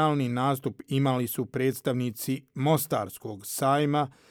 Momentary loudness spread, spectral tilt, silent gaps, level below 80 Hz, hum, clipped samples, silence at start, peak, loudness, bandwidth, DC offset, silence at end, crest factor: 8 LU; -6 dB/octave; none; -70 dBFS; none; under 0.1%; 0 s; -10 dBFS; -28 LUFS; over 20 kHz; under 0.1%; 0.2 s; 16 dB